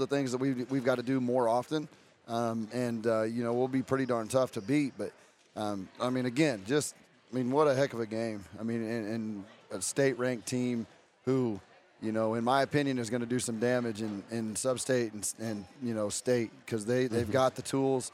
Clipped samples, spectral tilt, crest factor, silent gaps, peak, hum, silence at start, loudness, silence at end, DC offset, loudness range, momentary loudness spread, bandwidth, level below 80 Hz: under 0.1%; -5 dB/octave; 18 dB; none; -14 dBFS; none; 0 s; -32 LUFS; 0.05 s; under 0.1%; 2 LU; 10 LU; 15.5 kHz; -72 dBFS